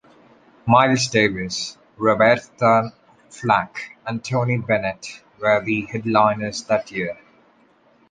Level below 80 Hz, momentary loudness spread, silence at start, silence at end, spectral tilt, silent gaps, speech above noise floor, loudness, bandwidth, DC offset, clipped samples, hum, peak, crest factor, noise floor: -56 dBFS; 15 LU; 0.65 s; 0.95 s; -5 dB/octave; none; 37 dB; -20 LUFS; 9.8 kHz; under 0.1%; under 0.1%; none; -2 dBFS; 20 dB; -57 dBFS